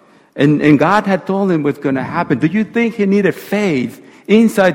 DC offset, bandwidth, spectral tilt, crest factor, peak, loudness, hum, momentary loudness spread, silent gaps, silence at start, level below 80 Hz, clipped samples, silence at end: under 0.1%; 17 kHz; -7 dB/octave; 14 dB; 0 dBFS; -14 LUFS; none; 8 LU; none; 0.35 s; -54 dBFS; under 0.1%; 0 s